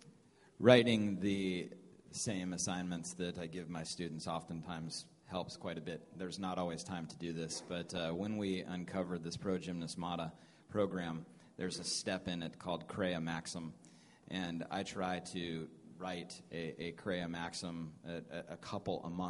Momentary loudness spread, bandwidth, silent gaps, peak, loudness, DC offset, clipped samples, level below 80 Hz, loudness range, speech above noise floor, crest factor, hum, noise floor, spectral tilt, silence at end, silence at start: 10 LU; 11.5 kHz; none; -10 dBFS; -40 LUFS; under 0.1%; under 0.1%; -70 dBFS; 5 LU; 26 dB; 30 dB; none; -65 dBFS; -4.5 dB/octave; 0 s; 0 s